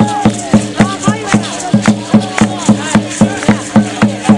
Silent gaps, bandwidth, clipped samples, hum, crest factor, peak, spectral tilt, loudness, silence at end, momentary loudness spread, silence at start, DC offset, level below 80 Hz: none; 11.5 kHz; 0.2%; none; 12 dB; 0 dBFS; -5.5 dB/octave; -12 LUFS; 0 s; 3 LU; 0 s; under 0.1%; -40 dBFS